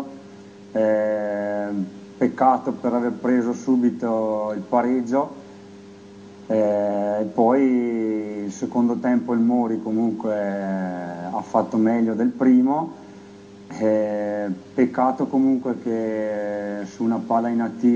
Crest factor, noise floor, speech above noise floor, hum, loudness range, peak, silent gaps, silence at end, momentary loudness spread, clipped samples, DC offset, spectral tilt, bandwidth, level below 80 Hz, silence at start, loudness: 18 dB; -43 dBFS; 22 dB; none; 2 LU; -4 dBFS; none; 0 s; 10 LU; under 0.1%; under 0.1%; -8 dB/octave; 7.4 kHz; -70 dBFS; 0 s; -22 LUFS